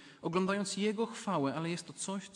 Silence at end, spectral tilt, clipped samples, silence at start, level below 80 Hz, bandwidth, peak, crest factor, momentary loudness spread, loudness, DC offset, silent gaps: 0 s; -4.5 dB/octave; under 0.1%; 0 s; -78 dBFS; 11.5 kHz; -20 dBFS; 16 dB; 7 LU; -35 LUFS; under 0.1%; none